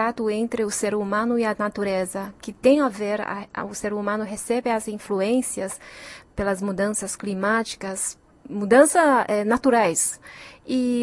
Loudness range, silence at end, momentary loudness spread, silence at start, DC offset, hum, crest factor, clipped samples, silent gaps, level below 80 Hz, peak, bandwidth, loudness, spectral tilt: 6 LU; 0 s; 13 LU; 0 s; under 0.1%; none; 20 dB; under 0.1%; none; -54 dBFS; -2 dBFS; 12 kHz; -23 LUFS; -4 dB/octave